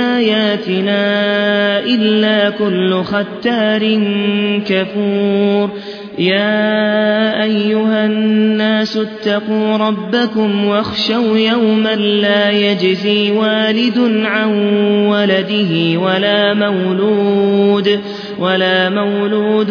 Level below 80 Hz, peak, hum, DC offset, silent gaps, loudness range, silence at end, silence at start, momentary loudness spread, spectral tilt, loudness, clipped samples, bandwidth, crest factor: -60 dBFS; 0 dBFS; none; under 0.1%; none; 2 LU; 0 s; 0 s; 4 LU; -7 dB/octave; -13 LUFS; under 0.1%; 5.4 kHz; 14 dB